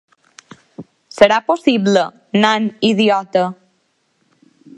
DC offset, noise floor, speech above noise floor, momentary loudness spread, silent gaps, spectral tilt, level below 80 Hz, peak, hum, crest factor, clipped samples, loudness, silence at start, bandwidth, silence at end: under 0.1%; -64 dBFS; 49 dB; 7 LU; none; -5 dB/octave; -58 dBFS; 0 dBFS; none; 18 dB; under 0.1%; -15 LUFS; 0.8 s; 11 kHz; 1.25 s